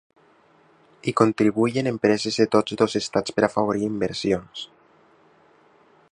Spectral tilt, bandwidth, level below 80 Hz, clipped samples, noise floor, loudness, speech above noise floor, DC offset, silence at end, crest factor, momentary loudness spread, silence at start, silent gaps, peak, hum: -5.5 dB/octave; 11 kHz; -58 dBFS; under 0.1%; -57 dBFS; -22 LUFS; 35 dB; under 0.1%; 1.45 s; 22 dB; 8 LU; 1.05 s; none; -2 dBFS; none